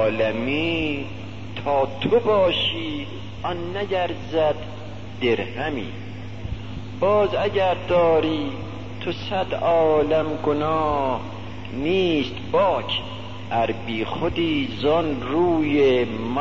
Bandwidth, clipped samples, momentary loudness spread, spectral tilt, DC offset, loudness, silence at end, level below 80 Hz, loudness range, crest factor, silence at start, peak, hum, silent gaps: 7.6 kHz; under 0.1%; 15 LU; -7 dB/octave; 1%; -22 LUFS; 0 s; -46 dBFS; 4 LU; 14 dB; 0 s; -8 dBFS; none; none